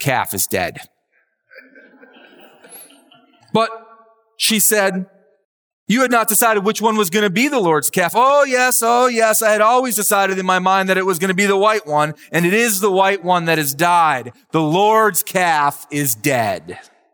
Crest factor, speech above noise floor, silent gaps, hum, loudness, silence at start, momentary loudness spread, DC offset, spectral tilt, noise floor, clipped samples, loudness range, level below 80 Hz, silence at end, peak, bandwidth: 14 dB; 48 dB; 5.45-5.87 s; none; -15 LUFS; 0 s; 7 LU; under 0.1%; -3 dB/octave; -64 dBFS; under 0.1%; 10 LU; -68 dBFS; 0.35 s; -2 dBFS; over 20 kHz